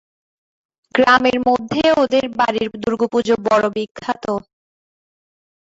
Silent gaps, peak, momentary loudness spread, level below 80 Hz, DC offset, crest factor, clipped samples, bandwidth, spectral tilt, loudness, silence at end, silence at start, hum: 3.91-3.95 s; -2 dBFS; 11 LU; -54 dBFS; under 0.1%; 18 dB; under 0.1%; 8 kHz; -5 dB/octave; -17 LUFS; 1.2 s; 0.95 s; none